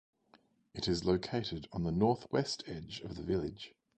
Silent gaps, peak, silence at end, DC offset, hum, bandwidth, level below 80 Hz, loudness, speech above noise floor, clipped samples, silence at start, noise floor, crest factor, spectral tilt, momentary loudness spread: none; -16 dBFS; 0.3 s; under 0.1%; none; 9.2 kHz; -56 dBFS; -36 LUFS; 33 dB; under 0.1%; 0.75 s; -68 dBFS; 20 dB; -6 dB/octave; 12 LU